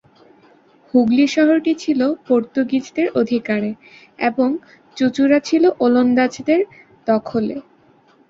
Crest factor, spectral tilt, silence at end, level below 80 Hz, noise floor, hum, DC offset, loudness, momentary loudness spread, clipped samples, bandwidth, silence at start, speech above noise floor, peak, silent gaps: 16 dB; -5.5 dB/octave; 0.7 s; -62 dBFS; -53 dBFS; none; under 0.1%; -18 LUFS; 12 LU; under 0.1%; 7.6 kHz; 0.95 s; 36 dB; -2 dBFS; none